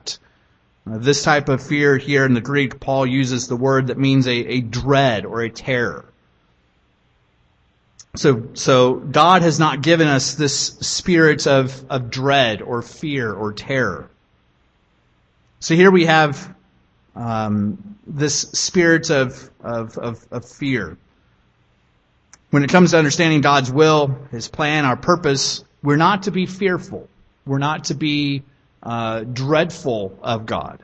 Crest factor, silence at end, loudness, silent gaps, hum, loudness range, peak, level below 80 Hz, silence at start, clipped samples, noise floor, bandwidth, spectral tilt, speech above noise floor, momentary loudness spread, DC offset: 18 dB; 0.05 s; -17 LUFS; none; none; 7 LU; 0 dBFS; -50 dBFS; 0.05 s; under 0.1%; -60 dBFS; 8.6 kHz; -5 dB/octave; 43 dB; 14 LU; under 0.1%